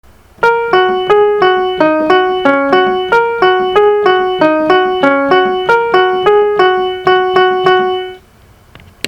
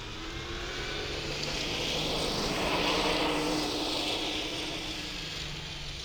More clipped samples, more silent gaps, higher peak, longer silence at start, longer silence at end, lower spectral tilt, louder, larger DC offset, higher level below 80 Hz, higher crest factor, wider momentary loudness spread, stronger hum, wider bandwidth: first, 0.2% vs under 0.1%; neither; first, 0 dBFS vs -16 dBFS; first, 0.4 s vs 0 s; about the same, 0 s vs 0 s; first, -5 dB/octave vs -3 dB/octave; first, -10 LUFS vs -31 LUFS; neither; about the same, -46 dBFS vs -44 dBFS; second, 10 dB vs 16 dB; second, 2 LU vs 9 LU; neither; second, 7.6 kHz vs over 20 kHz